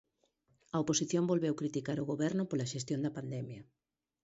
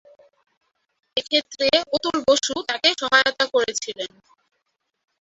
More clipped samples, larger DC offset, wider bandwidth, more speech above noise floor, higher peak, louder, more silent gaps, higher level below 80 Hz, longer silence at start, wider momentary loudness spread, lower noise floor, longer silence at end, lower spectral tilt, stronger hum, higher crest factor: neither; neither; about the same, 8 kHz vs 8 kHz; second, 41 dB vs 54 dB; second, -18 dBFS vs -2 dBFS; second, -35 LUFS vs -20 LUFS; neither; second, -72 dBFS vs -62 dBFS; second, 0.75 s vs 1.15 s; about the same, 10 LU vs 10 LU; about the same, -76 dBFS vs -75 dBFS; second, 0.6 s vs 1.15 s; first, -5.5 dB/octave vs -1 dB/octave; neither; about the same, 18 dB vs 22 dB